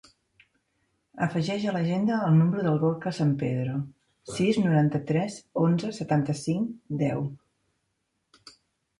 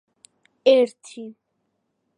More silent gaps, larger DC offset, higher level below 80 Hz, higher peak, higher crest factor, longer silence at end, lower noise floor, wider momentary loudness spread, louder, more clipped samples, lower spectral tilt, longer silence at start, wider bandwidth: neither; neither; first, -66 dBFS vs -86 dBFS; second, -10 dBFS vs -4 dBFS; about the same, 16 dB vs 20 dB; first, 1.65 s vs 0.85 s; about the same, -77 dBFS vs -74 dBFS; second, 10 LU vs 22 LU; second, -26 LUFS vs -19 LUFS; neither; first, -7.5 dB/octave vs -3.5 dB/octave; first, 1.15 s vs 0.65 s; about the same, 11 kHz vs 10.5 kHz